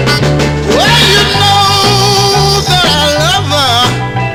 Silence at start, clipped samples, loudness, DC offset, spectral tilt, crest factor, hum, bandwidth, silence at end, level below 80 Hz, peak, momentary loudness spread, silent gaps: 0 s; 0.4%; -7 LUFS; under 0.1%; -3.5 dB/octave; 8 dB; none; 18.5 kHz; 0 s; -26 dBFS; 0 dBFS; 5 LU; none